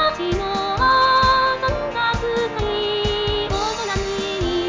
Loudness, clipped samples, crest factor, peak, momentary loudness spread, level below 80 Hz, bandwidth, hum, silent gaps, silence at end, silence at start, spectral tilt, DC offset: -19 LUFS; under 0.1%; 14 dB; -6 dBFS; 8 LU; -34 dBFS; 7.6 kHz; none; none; 0 s; 0 s; -4.5 dB/octave; under 0.1%